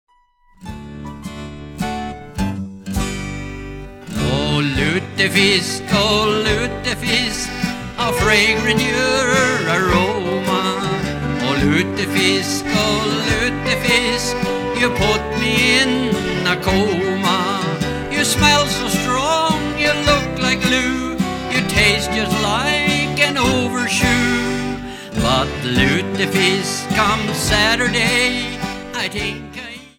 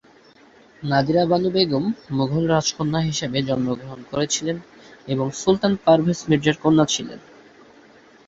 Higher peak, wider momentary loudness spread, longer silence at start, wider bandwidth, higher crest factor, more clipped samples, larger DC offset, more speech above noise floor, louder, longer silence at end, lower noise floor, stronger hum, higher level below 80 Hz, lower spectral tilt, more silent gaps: about the same, 0 dBFS vs -2 dBFS; about the same, 12 LU vs 11 LU; second, 0.6 s vs 0.8 s; first, 19 kHz vs 8 kHz; about the same, 18 dB vs 18 dB; neither; neither; first, 37 dB vs 31 dB; first, -17 LUFS vs -21 LUFS; second, 0.1 s vs 1.1 s; about the same, -54 dBFS vs -51 dBFS; neither; first, -34 dBFS vs -54 dBFS; about the same, -4 dB/octave vs -5 dB/octave; neither